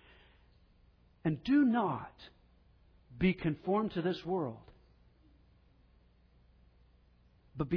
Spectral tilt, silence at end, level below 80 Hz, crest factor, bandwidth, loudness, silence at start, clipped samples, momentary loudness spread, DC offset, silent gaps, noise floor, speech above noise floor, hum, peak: -6.5 dB/octave; 0 s; -60 dBFS; 18 dB; 5.4 kHz; -33 LUFS; 1.25 s; under 0.1%; 24 LU; under 0.1%; none; -65 dBFS; 33 dB; 60 Hz at -60 dBFS; -18 dBFS